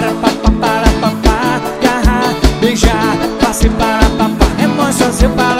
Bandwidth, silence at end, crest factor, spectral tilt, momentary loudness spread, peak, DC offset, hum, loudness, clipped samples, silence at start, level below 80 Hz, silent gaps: 16.5 kHz; 0 s; 12 dB; -5 dB/octave; 2 LU; 0 dBFS; under 0.1%; none; -12 LUFS; 0.4%; 0 s; -18 dBFS; none